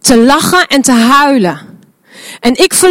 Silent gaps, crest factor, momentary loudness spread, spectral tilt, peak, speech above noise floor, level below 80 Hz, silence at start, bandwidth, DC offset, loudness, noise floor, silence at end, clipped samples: none; 8 dB; 9 LU; -3 dB/octave; 0 dBFS; 31 dB; -40 dBFS; 0.05 s; 17 kHz; under 0.1%; -8 LUFS; -38 dBFS; 0 s; 1%